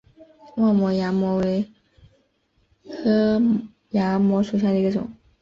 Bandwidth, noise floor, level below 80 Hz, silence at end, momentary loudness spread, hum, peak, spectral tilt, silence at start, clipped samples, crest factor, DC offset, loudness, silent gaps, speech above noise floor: 7.2 kHz; -66 dBFS; -56 dBFS; 0.3 s; 10 LU; none; -10 dBFS; -8.5 dB/octave; 0.55 s; under 0.1%; 12 dB; under 0.1%; -22 LUFS; none; 46 dB